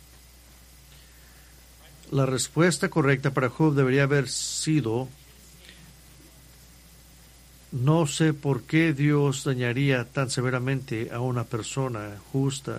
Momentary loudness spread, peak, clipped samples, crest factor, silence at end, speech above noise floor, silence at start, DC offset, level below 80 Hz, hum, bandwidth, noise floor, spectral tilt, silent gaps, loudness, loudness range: 8 LU; -8 dBFS; under 0.1%; 20 dB; 0 s; 27 dB; 2.05 s; under 0.1%; -54 dBFS; none; 15.5 kHz; -51 dBFS; -5.5 dB/octave; none; -25 LUFS; 7 LU